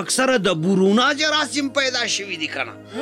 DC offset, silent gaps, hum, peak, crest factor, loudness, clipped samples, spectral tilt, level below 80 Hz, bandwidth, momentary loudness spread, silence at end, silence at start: under 0.1%; none; none; -8 dBFS; 12 dB; -19 LUFS; under 0.1%; -3.5 dB/octave; -60 dBFS; 14.5 kHz; 9 LU; 0 s; 0 s